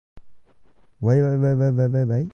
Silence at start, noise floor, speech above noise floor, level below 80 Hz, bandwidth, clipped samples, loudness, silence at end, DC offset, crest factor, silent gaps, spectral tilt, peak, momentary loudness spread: 0.15 s; -57 dBFS; 39 dB; -56 dBFS; 6.4 kHz; under 0.1%; -20 LUFS; 0.05 s; under 0.1%; 16 dB; none; -10.5 dB/octave; -6 dBFS; 3 LU